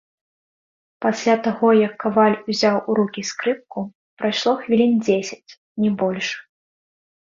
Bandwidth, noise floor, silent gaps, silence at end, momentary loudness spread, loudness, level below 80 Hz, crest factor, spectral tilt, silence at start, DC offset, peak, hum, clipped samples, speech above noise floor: 7.6 kHz; under -90 dBFS; 3.95-4.17 s, 5.57-5.75 s; 1 s; 14 LU; -20 LUFS; -64 dBFS; 18 dB; -5 dB/octave; 1 s; under 0.1%; -4 dBFS; none; under 0.1%; over 71 dB